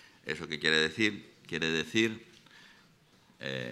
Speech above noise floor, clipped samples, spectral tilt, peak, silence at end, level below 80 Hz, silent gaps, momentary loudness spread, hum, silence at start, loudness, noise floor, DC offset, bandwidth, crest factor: 32 dB; under 0.1%; -3.5 dB/octave; -12 dBFS; 0 s; -70 dBFS; none; 15 LU; none; 0.25 s; -30 LUFS; -63 dBFS; under 0.1%; 13.5 kHz; 22 dB